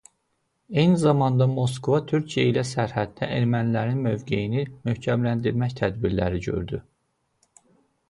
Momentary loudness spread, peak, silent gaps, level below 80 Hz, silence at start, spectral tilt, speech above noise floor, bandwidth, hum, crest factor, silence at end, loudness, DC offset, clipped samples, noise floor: 8 LU; -6 dBFS; none; -48 dBFS; 0.7 s; -7 dB/octave; 50 dB; 11.5 kHz; none; 18 dB; 1.3 s; -24 LUFS; under 0.1%; under 0.1%; -73 dBFS